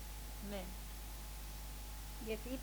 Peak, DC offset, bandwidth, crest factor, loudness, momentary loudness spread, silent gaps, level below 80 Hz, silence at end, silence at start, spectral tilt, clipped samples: -30 dBFS; under 0.1%; over 20 kHz; 16 dB; -48 LUFS; 4 LU; none; -48 dBFS; 0 s; 0 s; -4 dB/octave; under 0.1%